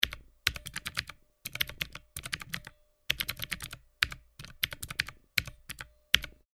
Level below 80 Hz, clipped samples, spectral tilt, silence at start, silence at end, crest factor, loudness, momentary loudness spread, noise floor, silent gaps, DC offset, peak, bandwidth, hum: -52 dBFS; under 0.1%; -1 dB/octave; 0 s; 0.25 s; 36 dB; -34 LUFS; 16 LU; -55 dBFS; none; under 0.1%; 0 dBFS; over 20 kHz; none